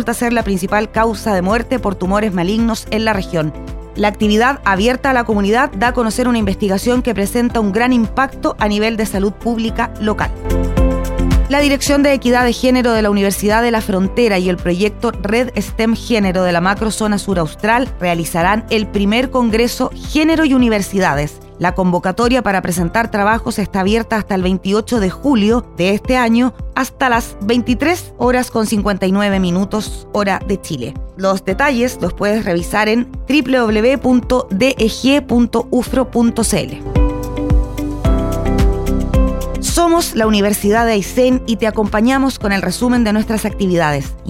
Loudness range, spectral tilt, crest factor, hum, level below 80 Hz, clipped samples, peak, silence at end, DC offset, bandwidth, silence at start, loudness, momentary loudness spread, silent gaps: 3 LU; -5 dB/octave; 14 dB; none; -26 dBFS; under 0.1%; 0 dBFS; 0 s; under 0.1%; 16.5 kHz; 0 s; -15 LUFS; 6 LU; none